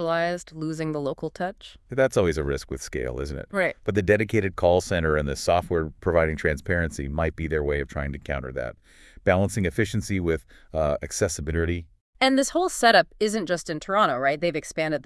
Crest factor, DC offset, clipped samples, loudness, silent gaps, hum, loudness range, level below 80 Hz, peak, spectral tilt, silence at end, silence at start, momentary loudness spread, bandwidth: 20 dB; under 0.1%; under 0.1%; -25 LUFS; 12.01-12.13 s; none; 4 LU; -42 dBFS; -4 dBFS; -5 dB/octave; 0.05 s; 0 s; 10 LU; 12 kHz